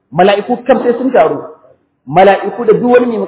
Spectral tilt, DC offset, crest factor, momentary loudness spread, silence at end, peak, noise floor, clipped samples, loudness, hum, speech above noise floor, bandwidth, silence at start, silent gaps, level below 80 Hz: -10 dB/octave; under 0.1%; 10 dB; 6 LU; 0 s; 0 dBFS; -48 dBFS; 0.3%; -10 LUFS; none; 38 dB; 4 kHz; 0.1 s; none; -52 dBFS